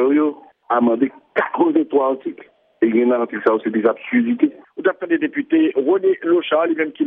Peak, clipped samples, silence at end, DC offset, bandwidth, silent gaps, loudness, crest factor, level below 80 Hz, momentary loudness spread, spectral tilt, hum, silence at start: -4 dBFS; under 0.1%; 0 s; under 0.1%; 3.8 kHz; none; -18 LUFS; 14 dB; -72 dBFS; 5 LU; -9 dB/octave; none; 0 s